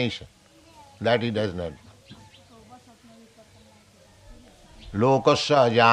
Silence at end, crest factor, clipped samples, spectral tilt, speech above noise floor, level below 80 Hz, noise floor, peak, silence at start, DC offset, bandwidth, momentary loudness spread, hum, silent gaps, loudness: 0 s; 22 dB; under 0.1%; -5.5 dB/octave; 33 dB; -56 dBFS; -54 dBFS; -4 dBFS; 0 s; under 0.1%; 11.5 kHz; 15 LU; none; none; -23 LUFS